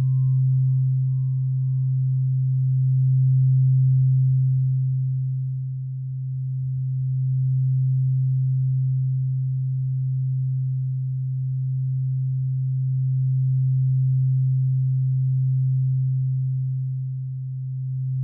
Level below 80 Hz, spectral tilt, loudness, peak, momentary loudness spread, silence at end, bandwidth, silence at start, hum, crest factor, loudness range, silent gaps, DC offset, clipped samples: -56 dBFS; -16.5 dB/octave; -23 LUFS; -14 dBFS; 9 LU; 0 s; 0.3 kHz; 0 s; none; 8 dB; 5 LU; none; under 0.1%; under 0.1%